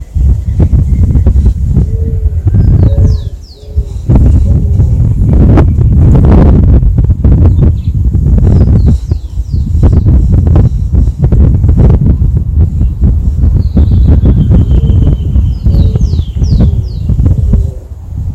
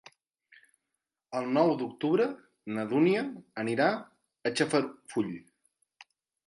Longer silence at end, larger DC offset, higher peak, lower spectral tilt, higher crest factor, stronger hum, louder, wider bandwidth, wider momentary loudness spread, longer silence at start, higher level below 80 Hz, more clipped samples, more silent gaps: second, 0 s vs 1.05 s; neither; first, 0 dBFS vs -10 dBFS; first, -10 dB/octave vs -5.5 dB/octave; second, 6 dB vs 20 dB; neither; first, -8 LUFS vs -30 LUFS; second, 5.8 kHz vs 11.5 kHz; second, 7 LU vs 12 LU; second, 0 s vs 1.3 s; first, -10 dBFS vs -78 dBFS; first, 2% vs under 0.1%; neither